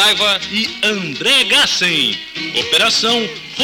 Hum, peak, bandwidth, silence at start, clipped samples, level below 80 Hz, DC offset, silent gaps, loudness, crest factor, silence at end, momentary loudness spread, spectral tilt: none; -6 dBFS; 19 kHz; 0 s; under 0.1%; -54 dBFS; under 0.1%; none; -13 LUFS; 10 dB; 0 s; 8 LU; -1.5 dB/octave